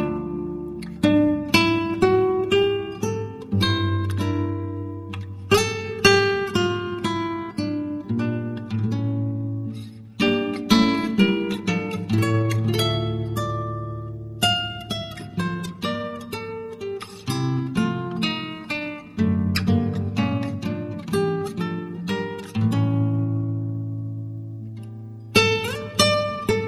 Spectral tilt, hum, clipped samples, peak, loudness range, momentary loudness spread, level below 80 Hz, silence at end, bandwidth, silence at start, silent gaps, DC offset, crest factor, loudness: -5.5 dB/octave; none; under 0.1%; -2 dBFS; 6 LU; 13 LU; -50 dBFS; 0 s; 15 kHz; 0 s; none; under 0.1%; 22 dB; -23 LUFS